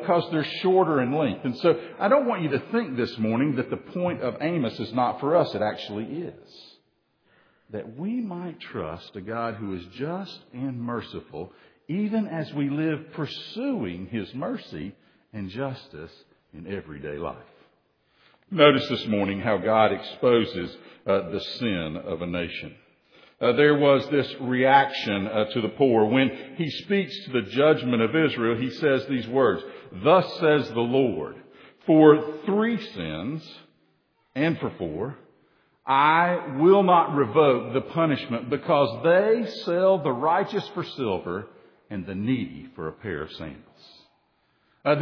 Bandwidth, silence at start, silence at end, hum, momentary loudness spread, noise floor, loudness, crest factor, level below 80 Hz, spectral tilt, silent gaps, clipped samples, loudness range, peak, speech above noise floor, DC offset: 5.4 kHz; 0 s; 0 s; none; 17 LU; -69 dBFS; -24 LUFS; 22 dB; -62 dBFS; -8 dB/octave; none; under 0.1%; 12 LU; -2 dBFS; 45 dB; under 0.1%